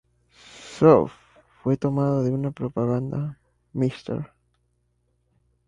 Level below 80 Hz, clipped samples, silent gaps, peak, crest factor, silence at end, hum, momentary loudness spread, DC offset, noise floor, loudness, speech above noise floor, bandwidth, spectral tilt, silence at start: -56 dBFS; under 0.1%; none; -4 dBFS; 22 dB; 1.4 s; 60 Hz at -45 dBFS; 18 LU; under 0.1%; -69 dBFS; -24 LUFS; 48 dB; 10 kHz; -8.5 dB/octave; 0.55 s